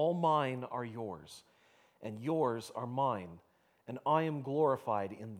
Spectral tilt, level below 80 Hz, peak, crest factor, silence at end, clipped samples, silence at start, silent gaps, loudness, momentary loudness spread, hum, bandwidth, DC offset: -7 dB/octave; -78 dBFS; -16 dBFS; 20 dB; 0 s; under 0.1%; 0 s; none; -35 LUFS; 17 LU; none; 15 kHz; under 0.1%